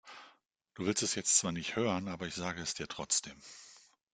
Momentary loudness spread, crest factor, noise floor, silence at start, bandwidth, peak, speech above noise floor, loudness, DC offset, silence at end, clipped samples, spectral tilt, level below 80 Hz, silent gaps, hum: 22 LU; 24 dB; -66 dBFS; 0.05 s; 10.5 kHz; -12 dBFS; 31 dB; -33 LUFS; under 0.1%; 0.35 s; under 0.1%; -2.5 dB/octave; -68 dBFS; none; none